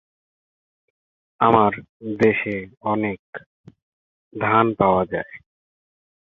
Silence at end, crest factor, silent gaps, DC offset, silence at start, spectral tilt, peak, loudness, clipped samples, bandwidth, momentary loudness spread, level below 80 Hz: 0.95 s; 22 dB; 1.89-2.00 s, 2.77-2.81 s, 3.19-3.33 s, 3.46-3.64 s, 3.82-4.31 s; under 0.1%; 1.4 s; -8.5 dB/octave; -2 dBFS; -20 LUFS; under 0.1%; 7 kHz; 19 LU; -54 dBFS